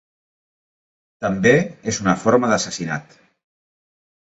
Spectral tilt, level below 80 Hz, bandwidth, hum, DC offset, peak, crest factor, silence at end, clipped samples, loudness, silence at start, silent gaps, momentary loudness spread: -5 dB/octave; -54 dBFS; 8.2 kHz; none; under 0.1%; -2 dBFS; 20 dB; 1.2 s; under 0.1%; -19 LUFS; 1.2 s; none; 11 LU